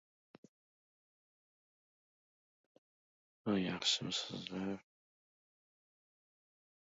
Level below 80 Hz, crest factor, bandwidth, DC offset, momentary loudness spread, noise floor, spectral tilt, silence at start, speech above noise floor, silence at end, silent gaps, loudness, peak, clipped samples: -78 dBFS; 24 dB; 7.4 kHz; under 0.1%; 11 LU; under -90 dBFS; -3 dB/octave; 3.45 s; over 51 dB; 2.15 s; none; -38 LUFS; -20 dBFS; under 0.1%